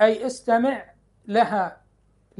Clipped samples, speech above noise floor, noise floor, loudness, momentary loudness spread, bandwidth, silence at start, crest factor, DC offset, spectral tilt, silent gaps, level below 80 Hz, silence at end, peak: under 0.1%; 40 dB; -61 dBFS; -23 LUFS; 9 LU; 11.5 kHz; 0 s; 20 dB; under 0.1%; -5 dB/octave; none; -64 dBFS; 0.65 s; -4 dBFS